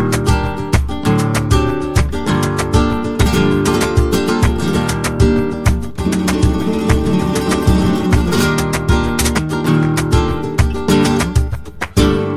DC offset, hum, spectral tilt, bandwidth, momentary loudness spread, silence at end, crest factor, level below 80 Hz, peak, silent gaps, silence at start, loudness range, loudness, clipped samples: under 0.1%; none; -6 dB/octave; 16 kHz; 4 LU; 0 s; 14 dB; -22 dBFS; 0 dBFS; none; 0 s; 1 LU; -15 LUFS; under 0.1%